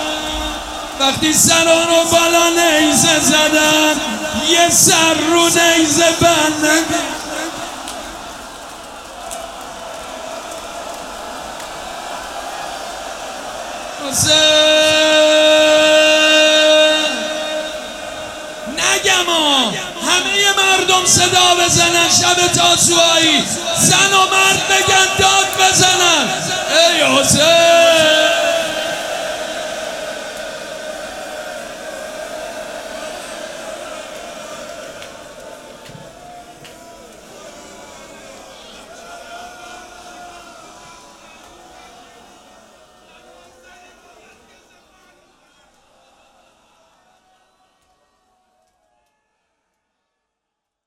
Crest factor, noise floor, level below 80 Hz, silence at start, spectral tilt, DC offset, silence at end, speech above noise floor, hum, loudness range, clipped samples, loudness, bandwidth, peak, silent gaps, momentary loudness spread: 16 dB; -79 dBFS; -46 dBFS; 0 s; -1.5 dB/octave; under 0.1%; 9.95 s; 67 dB; none; 18 LU; under 0.1%; -11 LUFS; 16.5 kHz; 0 dBFS; none; 20 LU